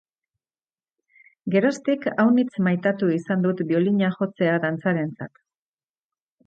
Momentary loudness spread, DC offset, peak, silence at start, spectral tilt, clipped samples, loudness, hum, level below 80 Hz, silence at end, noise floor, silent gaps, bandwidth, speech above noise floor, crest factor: 7 LU; under 0.1%; -8 dBFS; 1.45 s; -7.5 dB/octave; under 0.1%; -22 LUFS; none; -70 dBFS; 1.2 s; under -90 dBFS; none; 8.6 kHz; over 68 dB; 16 dB